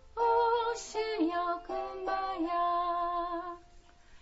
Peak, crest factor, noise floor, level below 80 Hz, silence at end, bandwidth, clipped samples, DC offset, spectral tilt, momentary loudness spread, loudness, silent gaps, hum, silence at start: -18 dBFS; 14 dB; -56 dBFS; -58 dBFS; 0.05 s; 7.6 kHz; under 0.1%; under 0.1%; -1.5 dB/octave; 10 LU; -32 LUFS; none; none; 0.05 s